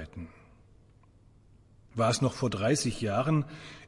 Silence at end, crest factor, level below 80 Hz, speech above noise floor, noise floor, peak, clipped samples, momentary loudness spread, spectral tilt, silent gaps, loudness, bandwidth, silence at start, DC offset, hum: 0 s; 18 dB; -58 dBFS; 30 dB; -59 dBFS; -14 dBFS; under 0.1%; 17 LU; -5.5 dB/octave; none; -29 LUFS; 11.5 kHz; 0 s; under 0.1%; none